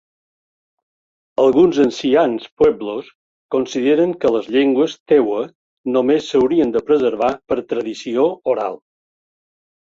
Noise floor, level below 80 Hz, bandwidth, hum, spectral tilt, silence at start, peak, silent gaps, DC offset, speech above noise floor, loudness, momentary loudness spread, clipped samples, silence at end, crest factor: under -90 dBFS; -56 dBFS; 7.6 kHz; none; -6 dB/octave; 1.4 s; -2 dBFS; 2.52-2.57 s, 3.15-3.49 s, 5.00-5.06 s, 5.55-5.84 s; under 0.1%; over 74 dB; -17 LUFS; 10 LU; under 0.1%; 1.05 s; 16 dB